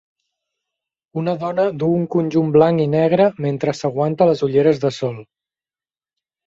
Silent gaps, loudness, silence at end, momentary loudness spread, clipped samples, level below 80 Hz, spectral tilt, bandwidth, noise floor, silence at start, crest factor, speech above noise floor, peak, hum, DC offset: none; -18 LUFS; 1.25 s; 10 LU; under 0.1%; -58 dBFS; -8 dB/octave; 7.8 kHz; under -90 dBFS; 1.15 s; 18 dB; over 73 dB; -2 dBFS; none; under 0.1%